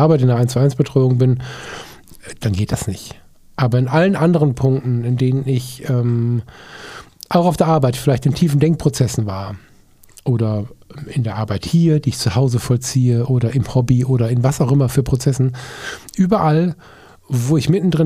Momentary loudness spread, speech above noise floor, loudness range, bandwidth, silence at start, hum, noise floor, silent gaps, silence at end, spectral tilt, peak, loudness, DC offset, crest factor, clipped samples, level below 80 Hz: 16 LU; 31 dB; 3 LU; 15 kHz; 0 s; none; -47 dBFS; none; 0 s; -7 dB/octave; 0 dBFS; -17 LUFS; under 0.1%; 16 dB; under 0.1%; -42 dBFS